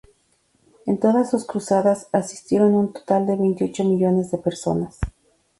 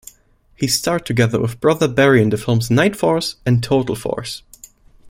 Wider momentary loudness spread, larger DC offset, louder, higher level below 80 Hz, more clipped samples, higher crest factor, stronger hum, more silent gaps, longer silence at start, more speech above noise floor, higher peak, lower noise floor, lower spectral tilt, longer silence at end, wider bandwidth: second, 8 LU vs 11 LU; neither; second, -21 LUFS vs -17 LUFS; about the same, -44 dBFS vs -46 dBFS; neither; about the same, 18 dB vs 16 dB; neither; neither; first, 0.85 s vs 0.6 s; first, 44 dB vs 37 dB; about the same, -4 dBFS vs -2 dBFS; first, -64 dBFS vs -53 dBFS; first, -7 dB/octave vs -5.5 dB/octave; first, 0.5 s vs 0 s; second, 11.5 kHz vs 16.5 kHz